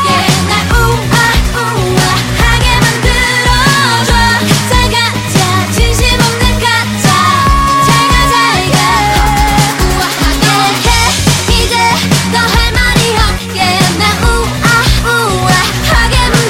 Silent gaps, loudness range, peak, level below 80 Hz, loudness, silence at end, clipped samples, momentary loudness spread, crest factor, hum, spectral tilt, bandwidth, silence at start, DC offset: none; 1 LU; 0 dBFS; -16 dBFS; -9 LUFS; 0 s; under 0.1%; 3 LU; 8 dB; none; -3.5 dB/octave; 17 kHz; 0 s; under 0.1%